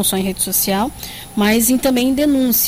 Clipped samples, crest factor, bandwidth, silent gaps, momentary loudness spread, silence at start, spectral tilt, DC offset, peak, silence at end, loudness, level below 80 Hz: under 0.1%; 14 dB; 16.5 kHz; none; 9 LU; 0 s; -3.5 dB/octave; under 0.1%; -2 dBFS; 0 s; -16 LUFS; -40 dBFS